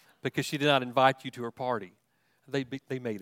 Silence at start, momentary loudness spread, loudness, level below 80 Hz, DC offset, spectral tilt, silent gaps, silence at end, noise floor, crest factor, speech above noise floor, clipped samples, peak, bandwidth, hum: 0.25 s; 12 LU; -30 LUFS; -74 dBFS; under 0.1%; -5 dB/octave; none; 0 s; -66 dBFS; 24 dB; 36 dB; under 0.1%; -8 dBFS; 16.5 kHz; none